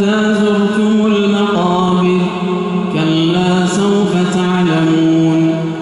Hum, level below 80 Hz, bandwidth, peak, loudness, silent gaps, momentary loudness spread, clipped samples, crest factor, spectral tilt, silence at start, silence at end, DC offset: none; -50 dBFS; 11.5 kHz; -2 dBFS; -13 LUFS; none; 4 LU; under 0.1%; 10 dB; -6.5 dB/octave; 0 s; 0 s; under 0.1%